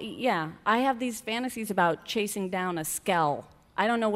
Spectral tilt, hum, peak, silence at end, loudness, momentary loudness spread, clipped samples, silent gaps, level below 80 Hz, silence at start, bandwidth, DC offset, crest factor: -4 dB/octave; none; -10 dBFS; 0 s; -28 LUFS; 6 LU; under 0.1%; none; -64 dBFS; 0 s; 16 kHz; under 0.1%; 18 dB